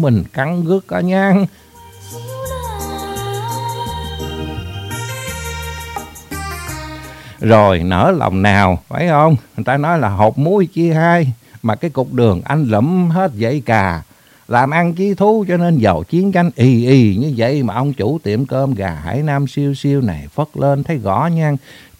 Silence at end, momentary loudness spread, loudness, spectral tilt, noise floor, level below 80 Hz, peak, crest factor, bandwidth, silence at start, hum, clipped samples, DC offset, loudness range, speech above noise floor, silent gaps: 0.25 s; 13 LU; -15 LUFS; -7 dB/octave; -35 dBFS; -38 dBFS; 0 dBFS; 16 dB; 16 kHz; 0 s; none; under 0.1%; under 0.1%; 11 LU; 21 dB; none